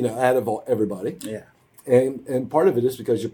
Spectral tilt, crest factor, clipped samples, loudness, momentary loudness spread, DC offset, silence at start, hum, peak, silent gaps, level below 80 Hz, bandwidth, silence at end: -6.5 dB/octave; 18 dB; under 0.1%; -22 LUFS; 14 LU; under 0.1%; 0 s; none; -4 dBFS; none; -64 dBFS; 19 kHz; 0.05 s